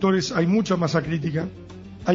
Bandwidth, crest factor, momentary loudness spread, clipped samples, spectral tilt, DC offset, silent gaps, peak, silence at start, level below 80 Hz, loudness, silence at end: 7.6 kHz; 16 dB; 15 LU; under 0.1%; -6.5 dB/octave; under 0.1%; none; -6 dBFS; 0 s; -50 dBFS; -23 LUFS; 0 s